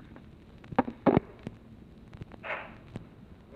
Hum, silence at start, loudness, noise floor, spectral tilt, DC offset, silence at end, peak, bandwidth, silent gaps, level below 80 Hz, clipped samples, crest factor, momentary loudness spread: none; 0 s; -31 LUFS; -51 dBFS; -9 dB/octave; under 0.1%; 0 s; -8 dBFS; 6.4 kHz; none; -56 dBFS; under 0.1%; 26 dB; 25 LU